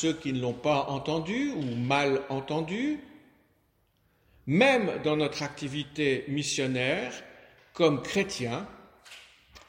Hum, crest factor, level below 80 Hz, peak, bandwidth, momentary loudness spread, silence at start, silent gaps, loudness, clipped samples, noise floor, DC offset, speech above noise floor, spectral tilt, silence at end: none; 22 dB; -62 dBFS; -8 dBFS; 16.5 kHz; 15 LU; 0 s; none; -29 LUFS; under 0.1%; -70 dBFS; under 0.1%; 41 dB; -5 dB/octave; 0.1 s